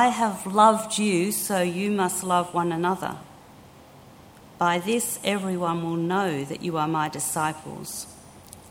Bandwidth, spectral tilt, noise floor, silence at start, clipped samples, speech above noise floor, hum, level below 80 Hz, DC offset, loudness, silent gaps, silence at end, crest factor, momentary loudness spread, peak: 19 kHz; -4 dB/octave; -49 dBFS; 0 s; under 0.1%; 24 dB; none; -62 dBFS; under 0.1%; -24 LUFS; none; 0 s; 22 dB; 14 LU; -4 dBFS